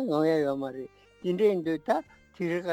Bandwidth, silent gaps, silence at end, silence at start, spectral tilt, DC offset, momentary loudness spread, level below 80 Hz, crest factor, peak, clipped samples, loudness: 16 kHz; none; 0 s; 0 s; -7 dB/octave; under 0.1%; 12 LU; -68 dBFS; 16 dB; -12 dBFS; under 0.1%; -29 LUFS